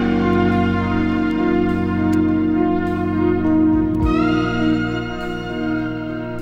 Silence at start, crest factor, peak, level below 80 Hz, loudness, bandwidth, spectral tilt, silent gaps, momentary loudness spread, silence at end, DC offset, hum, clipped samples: 0 s; 14 dB; -4 dBFS; -34 dBFS; -18 LUFS; 7.6 kHz; -8 dB/octave; none; 8 LU; 0 s; under 0.1%; 60 Hz at -45 dBFS; under 0.1%